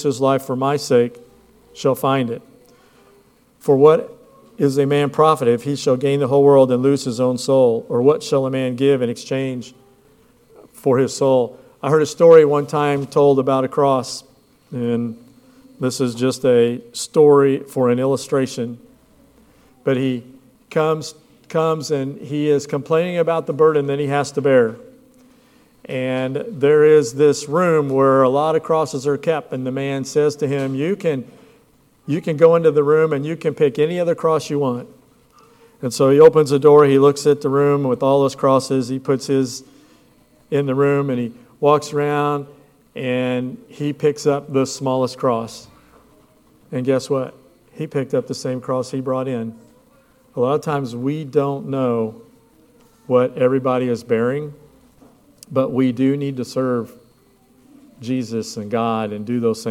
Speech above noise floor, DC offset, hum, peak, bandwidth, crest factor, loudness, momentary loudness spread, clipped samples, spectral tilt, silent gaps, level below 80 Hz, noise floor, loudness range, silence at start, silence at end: 38 dB; under 0.1%; none; 0 dBFS; 15 kHz; 18 dB; -18 LUFS; 12 LU; under 0.1%; -6.5 dB/octave; none; -64 dBFS; -55 dBFS; 8 LU; 0 s; 0 s